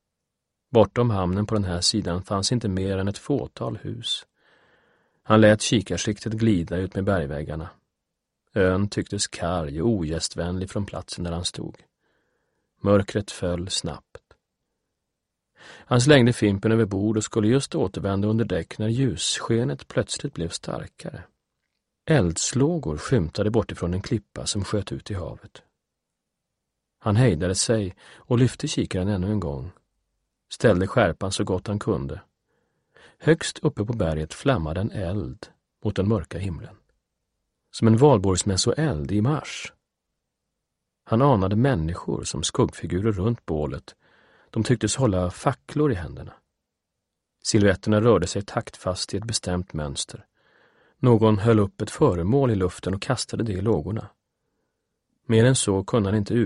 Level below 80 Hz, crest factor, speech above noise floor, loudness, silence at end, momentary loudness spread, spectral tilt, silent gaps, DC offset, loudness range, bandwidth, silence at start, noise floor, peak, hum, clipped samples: -46 dBFS; 24 dB; 59 dB; -24 LUFS; 0 s; 13 LU; -5.5 dB/octave; none; under 0.1%; 5 LU; 11.5 kHz; 0.7 s; -82 dBFS; 0 dBFS; none; under 0.1%